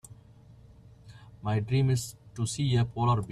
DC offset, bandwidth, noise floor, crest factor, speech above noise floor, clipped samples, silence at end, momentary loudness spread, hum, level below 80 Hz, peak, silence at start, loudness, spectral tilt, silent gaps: under 0.1%; 13.5 kHz; -54 dBFS; 18 dB; 27 dB; under 0.1%; 0 s; 9 LU; none; -54 dBFS; -12 dBFS; 0.1 s; -29 LUFS; -6 dB/octave; none